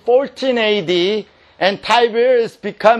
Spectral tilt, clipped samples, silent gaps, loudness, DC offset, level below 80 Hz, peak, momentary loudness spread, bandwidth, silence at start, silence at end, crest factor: -4.5 dB/octave; under 0.1%; none; -16 LUFS; under 0.1%; -60 dBFS; 0 dBFS; 5 LU; 11 kHz; 0.05 s; 0 s; 16 dB